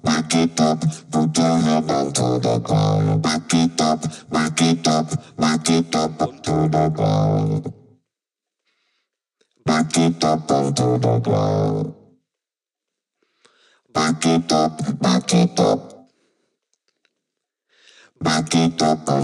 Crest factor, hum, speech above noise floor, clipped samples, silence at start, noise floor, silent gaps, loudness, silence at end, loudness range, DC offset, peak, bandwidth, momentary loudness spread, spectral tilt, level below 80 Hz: 18 dB; none; 70 dB; under 0.1%; 0.05 s; -88 dBFS; none; -19 LUFS; 0 s; 5 LU; under 0.1%; -2 dBFS; 12 kHz; 6 LU; -5.5 dB/octave; -54 dBFS